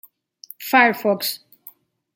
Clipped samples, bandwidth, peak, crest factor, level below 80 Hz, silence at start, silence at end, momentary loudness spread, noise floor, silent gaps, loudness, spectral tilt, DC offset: under 0.1%; 17 kHz; -2 dBFS; 20 dB; -76 dBFS; 0.6 s; 0.8 s; 19 LU; -48 dBFS; none; -18 LUFS; -3.5 dB/octave; under 0.1%